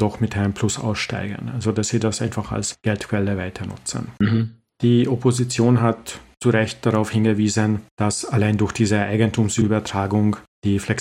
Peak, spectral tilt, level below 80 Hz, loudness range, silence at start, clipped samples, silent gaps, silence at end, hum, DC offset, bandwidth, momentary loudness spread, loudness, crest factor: -2 dBFS; -5.5 dB/octave; -50 dBFS; 4 LU; 0 s; under 0.1%; 7.91-7.97 s, 10.48-10.62 s; 0 s; none; under 0.1%; 12.5 kHz; 8 LU; -21 LUFS; 18 dB